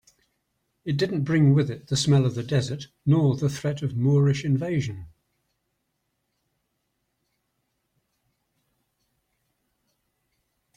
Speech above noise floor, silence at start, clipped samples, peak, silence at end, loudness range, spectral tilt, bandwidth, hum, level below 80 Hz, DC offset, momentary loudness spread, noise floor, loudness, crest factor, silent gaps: 54 dB; 0.85 s; under 0.1%; -10 dBFS; 5.7 s; 9 LU; -6.5 dB/octave; 9.8 kHz; none; -60 dBFS; under 0.1%; 10 LU; -77 dBFS; -24 LUFS; 16 dB; none